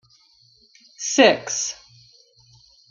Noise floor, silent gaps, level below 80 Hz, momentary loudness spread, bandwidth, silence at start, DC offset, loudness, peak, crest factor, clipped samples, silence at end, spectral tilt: -57 dBFS; none; -68 dBFS; 15 LU; 10 kHz; 1 s; under 0.1%; -19 LUFS; -2 dBFS; 22 dB; under 0.1%; 1.2 s; -1.5 dB/octave